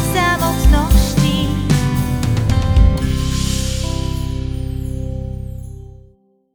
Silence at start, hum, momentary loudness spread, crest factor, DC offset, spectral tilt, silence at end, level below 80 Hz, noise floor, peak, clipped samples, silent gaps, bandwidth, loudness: 0 s; none; 13 LU; 16 dB; under 0.1%; -5.5 dB/octave; 0.55 s; -20 dBFS; -51 dBFS; 0 dBFS; under 0.1%; none; over 20 kHz; -17 LUFS